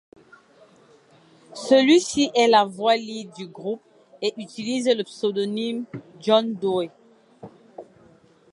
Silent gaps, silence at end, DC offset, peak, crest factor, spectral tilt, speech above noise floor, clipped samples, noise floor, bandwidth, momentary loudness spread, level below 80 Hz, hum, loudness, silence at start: none; 0.7 s; under 0.1%; -4 dBFS; 20 dB; -4 dB/octave; 33 dB; under 0.1%; -55 dBFS; 11.5 kHz; 18 LU; -70 dBFS; none; -22 LUFS; 1.5 s